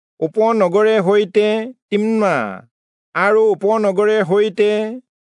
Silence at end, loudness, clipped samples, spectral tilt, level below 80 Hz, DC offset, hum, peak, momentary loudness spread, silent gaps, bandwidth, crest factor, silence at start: 0.3 s; -16 LUFS; under 0.1%; -6.5 dB/octave; -78 dBFS; under 0.1%; none; -4 dBFS; 10 LU; 1.82-1.89 s, 2.71-3.12 s; 10.5 kHz; 14 dB; 0.2 s